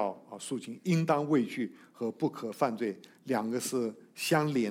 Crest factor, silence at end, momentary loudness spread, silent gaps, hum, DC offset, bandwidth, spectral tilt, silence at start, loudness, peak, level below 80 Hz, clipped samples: 18 dB; 0 s; 10 LU; none; none; under 0.1%; 16 kHz; -5.5 dB/octave; 0 s; -32 LUFS; -14 dBFS; -80 dBFS; under 0.1%